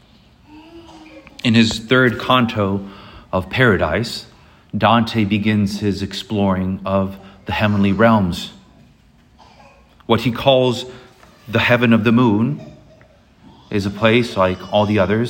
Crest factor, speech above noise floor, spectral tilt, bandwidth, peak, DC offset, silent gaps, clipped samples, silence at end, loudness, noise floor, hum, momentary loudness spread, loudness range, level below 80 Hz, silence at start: 18 dB; 34 dB; -6.5 dB/octave; 16.5 kHz; 0 dBFS; under 0.1%; none; under 0.1%; 0 s; -17 LUFS; -51 dBFS; none; 12 LU; 3 LU; -48 dBFS; 0.5 s